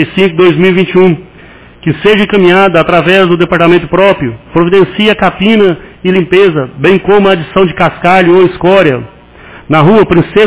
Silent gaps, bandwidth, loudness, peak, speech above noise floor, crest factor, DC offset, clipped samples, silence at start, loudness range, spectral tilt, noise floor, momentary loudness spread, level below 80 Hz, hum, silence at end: none; 4 kHz; -7 LUFS; 0 dBFS; 27 dB; 8 dB; 1%; 3%; 0 s; 1 LU; -10.5 dB/octave; -34 dBFS; 6 LU; -36 dBFS; none; 0 s